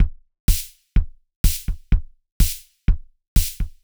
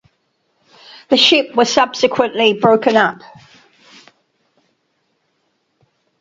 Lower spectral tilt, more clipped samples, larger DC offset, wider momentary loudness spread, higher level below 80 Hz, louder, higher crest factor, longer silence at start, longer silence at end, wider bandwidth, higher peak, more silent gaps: about the same, -4 dB/octave vs -3.5 dB/octave; neither; neither; about the same, 4 LU vs 6 LU; first, -22 dBFS vs -62 dBFS; second, -25 LUFS vs -13 LUFS; about the same, 16 dB vs 18 dB; second, 0 s vs 1.1 s; second, 0.15 s vs 3.05 s; first, over 20 kHz vs 7.8 kHz; second, -4 dBFS vs 0 dBFS; first, 0.40-0.48 s, 1.36-1.44 s, 2.32-2.40 s, 3.28-3.36 s vs none